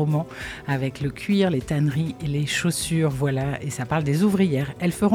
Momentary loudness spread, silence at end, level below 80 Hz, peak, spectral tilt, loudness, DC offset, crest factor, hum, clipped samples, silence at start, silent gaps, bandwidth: 7 LU; 0 s; -48 dBFS; -8 dBFS; -6 dB/octave; -24 LUFS; under 0.1%; 14 dB; none; under 0.1%; 0 s; none; 15.5 kHz